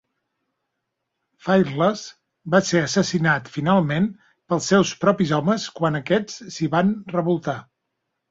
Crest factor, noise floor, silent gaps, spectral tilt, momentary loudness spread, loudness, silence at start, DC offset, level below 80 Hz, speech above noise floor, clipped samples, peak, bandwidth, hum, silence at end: 18 dB; -79 dBFS; none; -5.5 dB/octave; 11 LU; -21 LUFS; 1.45 s; under 0.1%; -58 dBFS; 58 dB; under 0.1%; -4 dBFS; 7.8 kHz; none; 0.7 s